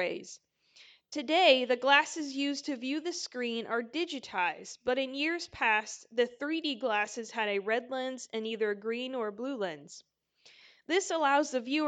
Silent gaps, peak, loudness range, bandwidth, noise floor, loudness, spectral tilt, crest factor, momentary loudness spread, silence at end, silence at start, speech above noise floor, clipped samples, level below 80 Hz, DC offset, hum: none; -10 dBFS; 6 LU; 9.4 kHz; -62 dBFS; -31 LUFS; -2 dB/octave; 22 dB; 12 LU; 0 s; 0 s; 30 dB; under 0.1%; -76 dBFS; under 0.1%; none